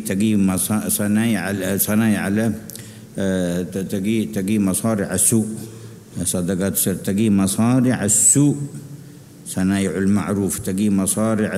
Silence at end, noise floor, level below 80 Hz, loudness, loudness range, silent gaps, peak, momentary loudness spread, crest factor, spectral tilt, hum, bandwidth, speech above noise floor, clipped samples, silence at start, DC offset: 0 s; -40 dBFS; -52 dBFS; -19 LUFS; 4 LU; none; -2 dBFS; 16 LU; 16 dB; -5 dB/octave; none; 16 kHz; 22 dB; under 0.1%; 0 s; under 0.1%